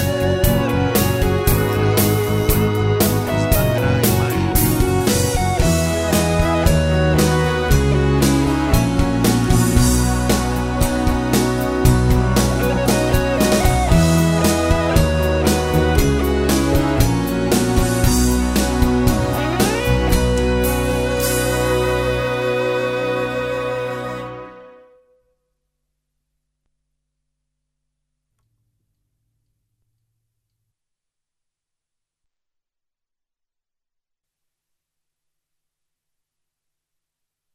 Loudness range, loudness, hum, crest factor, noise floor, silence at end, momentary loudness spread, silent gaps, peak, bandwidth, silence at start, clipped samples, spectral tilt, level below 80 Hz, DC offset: 5 LU; -17 LUFS; none; 18 dB; -82 dBFS; 12.85 s; 4 LU; none; 0 dBFS; 16.5 kHz; 0 s; under 0.1%; -5.5 dB/octave; -26 dBFS; under 0.1%